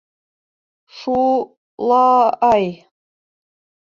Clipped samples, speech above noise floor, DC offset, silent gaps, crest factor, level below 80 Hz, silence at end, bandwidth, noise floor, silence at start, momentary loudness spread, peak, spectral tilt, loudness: under 0.1%; over 75 dB; under 0.1%; 1.57-1.78 s; 16 dB; -56 dBFS; 1.2 s; 7.2 kHz; under -90 dBFS; 0.95 s; 13 LU; -2 dBFS; -6.5 dB/octave; -16 LUFS